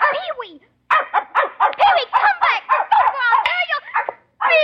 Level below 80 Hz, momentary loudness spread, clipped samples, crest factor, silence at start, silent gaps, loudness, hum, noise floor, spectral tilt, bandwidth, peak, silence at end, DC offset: -62 dBFS; 10 LU; under 0.1%; 14 dB; 0 s; none; -17 LUFS; none; -37 dBFS; -2 dB/octave; 7.8 kHz; -4 dBFS; 0 s; under 0.1%